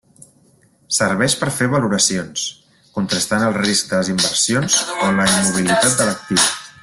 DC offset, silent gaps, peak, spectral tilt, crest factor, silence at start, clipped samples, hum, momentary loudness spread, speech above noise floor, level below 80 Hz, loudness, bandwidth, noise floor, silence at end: under 0.1%; none; -2 dBFS; -3 dB/octave; 16 dB; 0.9 s; under 0.1%; none; 7 LU; 37 dB; -52 dBFS; -16 LUFS; 12.5 kHz; -54 dBFS; 0.1 s